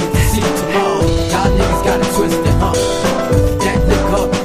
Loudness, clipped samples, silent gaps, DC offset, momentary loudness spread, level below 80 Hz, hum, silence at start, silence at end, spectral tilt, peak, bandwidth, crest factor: -14 LUFS; under 0.1%; none; under 0.1%; 1 LU; -22 dBFS; none; 0 s; 0 s; -5.5 dB/octave; 0 dBFS; 15.5 kHz; 12 dB